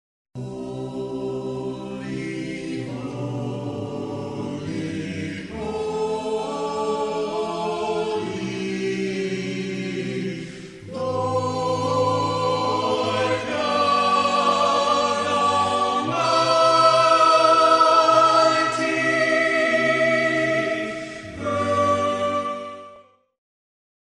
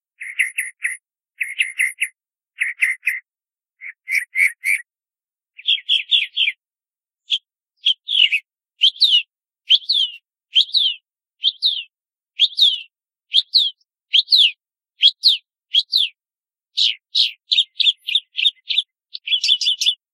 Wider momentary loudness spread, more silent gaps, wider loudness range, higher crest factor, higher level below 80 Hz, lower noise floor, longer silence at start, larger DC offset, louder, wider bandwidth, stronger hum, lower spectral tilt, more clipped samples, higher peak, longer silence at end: about the same, 15 LU vs 13 LU; neither; first, 13 LU vs 6 LU; about the same, 18 dB vs 20 dB; first, -56 dBFS vs under -90 dBFS; second, -50 dBFS vs under -90 dBFS; first, 0.35 s vs 0.2 s; neither; second, -21 LUFS vs -16 LUFS; second, 11 kHz vs 15.5 kHz; neither; first, -4.5 dB/octave vs 14 dB/octave; neither; second, -4 dBFS vs 0 dBFS; first, 1 s vs 0.2 s